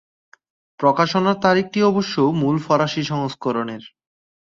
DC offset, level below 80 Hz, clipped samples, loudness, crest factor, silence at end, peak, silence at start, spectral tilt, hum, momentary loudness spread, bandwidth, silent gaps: under 0.1%; -60 dBFS; under 0.1%; -19 LUFS; 18 dB; 0.75 s; -2 dBFS; 0.8 s; -6 dB/octave; none; 7 LU; 7.6 kHz; none